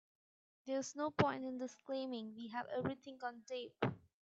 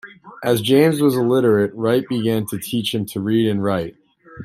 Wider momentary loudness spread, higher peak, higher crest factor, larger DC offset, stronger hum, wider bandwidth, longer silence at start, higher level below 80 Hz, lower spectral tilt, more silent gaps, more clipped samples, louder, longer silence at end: about the same, 11 LU vs 9 LU; second, -18 dBFS vs -2 dBFS; first, 26 dB vs 16 dB; neither; neither; second, 8.2 kHz vs 16 kHz; first, 0.65 s vs 0.05 s; second, -76 dBFS vs -58 dBFS; about the same, -5.5 dB/octave vs -6 dB/octave; neither; neither; second, -42 LUFS vs -18 LUFS; first, 0.2 s vs 0 s